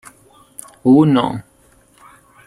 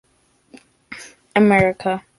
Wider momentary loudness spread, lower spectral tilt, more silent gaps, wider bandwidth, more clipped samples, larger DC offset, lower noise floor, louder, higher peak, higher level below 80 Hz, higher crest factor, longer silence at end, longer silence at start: first, 25 LU vs 22 LU; about the same, -7.5 dB/octave vs -6.5 dB/octave; neither; first, 13 kHz vs 11.5 kHz; neither; neither; second, -52 dBFS vs -58 dBFS; first, -14 LUFS vs -17 LUFS; about the same, -2 dBFS vs -2 dBFS; about the same, -54 dBFS vs -50 dBFS; about the same, 16 dB vs 18 dB; first, 1.05 s vs 0.2 s; about the same, 0.85 s vs 0.9 s